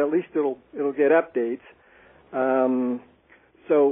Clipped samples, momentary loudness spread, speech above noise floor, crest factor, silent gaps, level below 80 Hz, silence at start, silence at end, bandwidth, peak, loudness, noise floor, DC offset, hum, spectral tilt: under 0.1%; 11 LU; 33 dB; 16 dB; none; -72 dBFS; 0 s; 0 s; 3.7 kHz; -8 dBFS; -24 LUFS; -57 dBFS; under 0.1%; none; -1 dB/octave